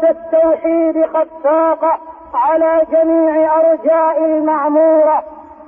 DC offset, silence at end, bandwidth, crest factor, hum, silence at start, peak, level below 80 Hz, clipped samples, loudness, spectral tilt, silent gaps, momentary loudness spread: under 0.1%; 0.15 s; 3.4 kHz; 8 dB; none; 0 s; -4 dBFS; -54 dBFS; under 0.1%; -13 LUFS; -9 dB/octave; none; 5 LU